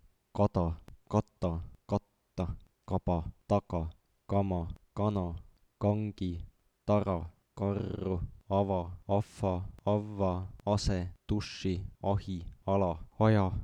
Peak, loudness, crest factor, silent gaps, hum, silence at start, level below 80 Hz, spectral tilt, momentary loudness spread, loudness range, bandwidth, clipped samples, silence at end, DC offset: -12 dBFS; -34 LUFS; 22 dB; none; none; 0.35 s; -48 dBFS; -8 dB/octave; 10 LU; 2 LU; 9.8 kHz; under 0.1%; 0 s; under 0.1%